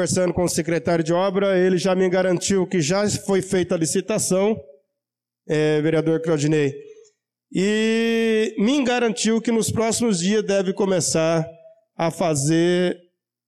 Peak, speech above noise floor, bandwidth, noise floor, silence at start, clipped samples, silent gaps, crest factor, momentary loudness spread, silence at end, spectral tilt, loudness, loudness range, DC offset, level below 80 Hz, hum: -12 dBFS; 66 dB; 14 kHz; -86 dBFS; 0 s; under 0.1%; none; 10 dB; 5 LU; 0.5 s; -5 dB/octave; -20 LUFS; 2 LU; under 0.1%; -56 dBFS; none